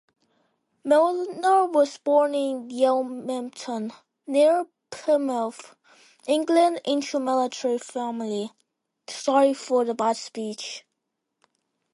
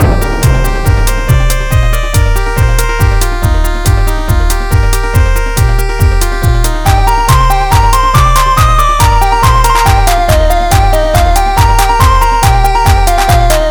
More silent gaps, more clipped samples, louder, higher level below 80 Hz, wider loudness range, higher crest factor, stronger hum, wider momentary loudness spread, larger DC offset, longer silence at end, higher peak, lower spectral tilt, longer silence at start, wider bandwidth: neither; second, under 0.1% vs 2%; second, -24 LUFS vs -9 LUFS; second, -80 dBFS vs -10 dBFS; about the same, 3 LU vs 3 LU; first, 18 dB vs 8 dB; neither; first, 15 LU vs 4 LU; neither; first, 1.15 s vs 0 s; second, -8 dBFS vs 0 dBFS; about the same, -4 dB/octave vs -4.5 dB/octave; first, 0.85 s vs 0 s; second, 11.5 kHz vs over 20 kHz